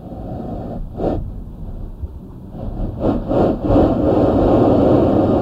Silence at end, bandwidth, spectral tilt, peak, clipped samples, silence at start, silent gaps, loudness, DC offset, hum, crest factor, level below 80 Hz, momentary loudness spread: 0 s; 7.4 kHz; -10.5 dB/octave; -2 dBFS; under 0.1%; 0 s; none; -16 LUFS; under 0.1%; none; 16 dB; -28 dBFS; 19 LU